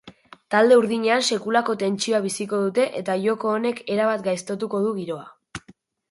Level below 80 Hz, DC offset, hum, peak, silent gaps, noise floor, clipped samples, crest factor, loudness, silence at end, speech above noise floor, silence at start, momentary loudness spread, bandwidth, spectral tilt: -64 dBFS; under 0.1%; none; -4 dBFS; none; -54 dBFS; under 0.1%; 18 dB; -22 LUFS; 0.5 s; 32 dB; 0.05 s; 15 LU; 11.5 kHz; -4 dB/octave